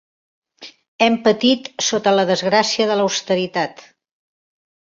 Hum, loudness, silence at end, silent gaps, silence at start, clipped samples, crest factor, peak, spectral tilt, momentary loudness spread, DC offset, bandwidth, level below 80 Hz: none; -17 LUFS; 1.15 s; 0.88-0.99 s; 0.6 s; under 0.1%; 18 dB; -2 dBFS; -3.5 dB/octave; 5 LU; under 0.1%; 7.8 kHz; -64 dBFS